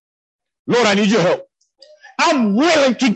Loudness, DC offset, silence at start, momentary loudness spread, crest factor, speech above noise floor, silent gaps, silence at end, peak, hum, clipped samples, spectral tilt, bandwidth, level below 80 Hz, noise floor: -15 LUFS; under 0.1%; 0.65 s; 10 LU; 14 dB; 35 dB; none; 0 s; -4 dBFS; none; under 0.1%; -4.5 dB/octave; 8.8 kHz; -62 dBFS; -49 dBFS